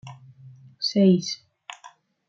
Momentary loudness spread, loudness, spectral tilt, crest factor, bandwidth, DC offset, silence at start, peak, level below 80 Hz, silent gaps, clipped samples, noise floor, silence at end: 25 LU; -22 LUFS; -6 dB/octave; 18 dB; 7.4 kHz; under 0.1%; 0.05 s; -8 dBFS; -72 dBFS; none; under 0.1%; -52 dBFS; 0.4 s